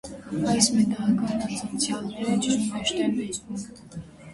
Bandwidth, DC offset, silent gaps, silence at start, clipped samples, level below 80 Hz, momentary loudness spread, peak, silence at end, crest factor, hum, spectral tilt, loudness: 11.5 kHz; under 0.1%; none; 0.05 s; under 0.1%; -56 dBFS; 16 LU; -4 dBFS; 0 s; 22 dB; none; -4 dB/octave; -25 LUFS